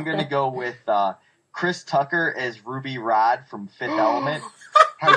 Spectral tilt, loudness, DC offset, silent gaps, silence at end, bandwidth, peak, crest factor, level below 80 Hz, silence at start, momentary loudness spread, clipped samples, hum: -5 dB/octave; -22 LUFS; under 0.1%; none; 0 s; 10 kHz; 0 dBFS; 22 dB; -70 dBFS; 0 s; 13 LU; under 0.1%; none